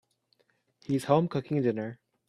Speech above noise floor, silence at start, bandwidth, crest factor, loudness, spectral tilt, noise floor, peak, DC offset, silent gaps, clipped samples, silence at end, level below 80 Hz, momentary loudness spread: 44 dB; 0.9 s; 14.5 kHz; 22 dB; -29 LUFS; -7.5 dB/octave; -71 dBFS; -8 dBFS; under 0.1%; none; under 0.1%; 0.35 s; -70 dBFS; 13 LU